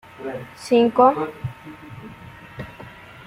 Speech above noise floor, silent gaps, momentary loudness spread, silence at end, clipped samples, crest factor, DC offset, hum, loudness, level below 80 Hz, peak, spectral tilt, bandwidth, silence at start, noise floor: 23 dB; none; 24 LU; 0.35 s; under 0.1%; 20 dB; under 0.1%; none; -19 LUFS; -56 dBFS; -4 dBFS; -6.5 dB/octave; 14 kHz; 0.2 s; -41 dBFS